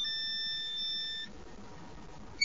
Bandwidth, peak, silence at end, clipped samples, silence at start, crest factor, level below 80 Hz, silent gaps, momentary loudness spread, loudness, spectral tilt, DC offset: 7.8 kHz; -16 dBFS; 0 s; under 0.1%; 0 s; 22 dB; -60 dBFS; none; 18 LU; -34 LUFS; -1 dB/octave; 0.4%